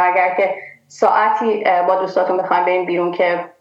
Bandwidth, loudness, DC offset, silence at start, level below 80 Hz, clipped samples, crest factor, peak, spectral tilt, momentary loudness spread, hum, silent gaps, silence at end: 7.8 kHz; -16 LUFS; under 0.1%; 0 s; -76 dBFS; under 0.1%; 14 dB; -2 dBFS; -5.5 dB/octave; 5 LU; none; none; 0.1 s